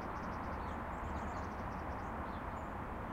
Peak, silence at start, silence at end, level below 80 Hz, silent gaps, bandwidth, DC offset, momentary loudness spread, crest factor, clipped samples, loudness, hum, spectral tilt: -30 dBFS; 0 s; 0 s; -50 dBFS; none; 16 kHz; under 0.1%; 2 LU; 12 dB; under 0.1%; -43 LUFS; none; -7 dB/octave